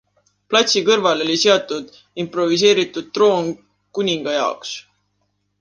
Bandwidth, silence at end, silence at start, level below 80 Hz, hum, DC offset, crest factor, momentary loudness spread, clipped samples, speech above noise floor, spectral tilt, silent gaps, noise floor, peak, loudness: 10 kHz; 0.8 s; 0.5 s; -66 dBFS; 50 Hz at -50 dBFS; under 0.1%; 18 dB; 15 LU; under 0.1%; 51 dB; -3 dB/octave; none; -69 dBFS; 0 dBFS; -17 LUFS